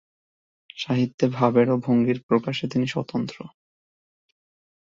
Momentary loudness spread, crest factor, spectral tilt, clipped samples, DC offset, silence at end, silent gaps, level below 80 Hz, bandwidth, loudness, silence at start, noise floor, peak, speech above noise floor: 15 LU; 20 dB; -7 dB/octave; under 0.1%; under 0.1%; 1.35 s; 1.14-1.18 s, 2.23-2.29 s; -64 dBFS; 7.6 kHz; -23 LUFS; 0.75 s; under -90 dBFS; -4 dBFS; over 67 dB